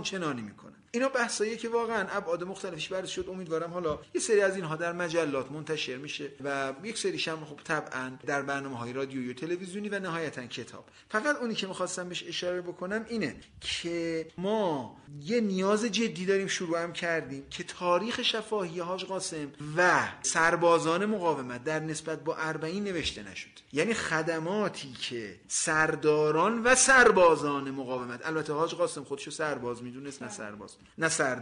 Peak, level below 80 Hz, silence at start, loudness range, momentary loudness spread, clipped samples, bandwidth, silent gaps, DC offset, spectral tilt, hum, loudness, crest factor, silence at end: -10 dBFS; -62 dBFS; 0 s; 9 LU; 13 LU; under 0.1%; 10.5 kHz; none; under 0.1%; -3.5 dB/octave; none; -30 LUFS; 20 dB; 0 s